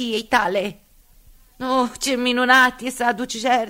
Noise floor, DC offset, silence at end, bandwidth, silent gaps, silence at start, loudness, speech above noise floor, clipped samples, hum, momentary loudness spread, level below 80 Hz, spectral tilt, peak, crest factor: -50 dBFS; under 0.1%; 0 s; 16 kHz; none; 0 s; -19 LUFS; 31 dB; under 0.1%; none; 10 LU; -52 dBFS; -2.5 dB/octave; -2 dBFS; 20 dB